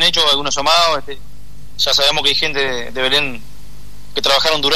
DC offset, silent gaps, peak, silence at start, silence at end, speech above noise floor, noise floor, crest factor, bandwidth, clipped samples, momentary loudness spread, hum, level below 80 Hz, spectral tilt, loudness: 7%; none; -2 dBFS; 0 s; 0 s; 22 dB; -38 dBFS; 14 dB; 13.5 kHz; under 0.1%; 12 LU; 50 Hz at -40 dBFS; -40 dBFS; -1.5 dB/octave; -14 LUFS